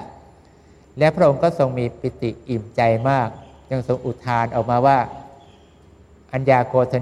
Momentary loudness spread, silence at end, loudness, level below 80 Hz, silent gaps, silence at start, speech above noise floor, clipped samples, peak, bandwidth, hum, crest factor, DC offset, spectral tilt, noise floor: 12 LU; 0 s; -20 LUFS; -50 dBFS; none; 0 s; 31 dB; under 0.1%; -2 dBFS; 10.5 kHz; none; 18 dB; under 0.1%; -8 dB/octave; -49 dBFS